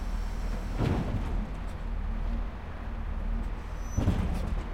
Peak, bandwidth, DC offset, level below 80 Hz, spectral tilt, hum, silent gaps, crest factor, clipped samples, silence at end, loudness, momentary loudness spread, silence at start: -14 dBFS; 10.5 kHz; under 0.1%; -32 dBFS; -7 dB/octave; none; none; 16 dB; under 0.1%; 0 s; -34 LUFS; 9 LU; 0 s